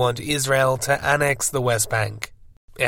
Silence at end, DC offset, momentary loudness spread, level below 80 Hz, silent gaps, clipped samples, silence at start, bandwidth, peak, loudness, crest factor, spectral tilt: 0 s; under 0.1%; 8 LU; -48 dBFS; 2.57-2.68 s; under 0.1%; 0 s; 17 kHz; -4 dBFS; -21 LUFS; 18 dB; -3.5 dB/octave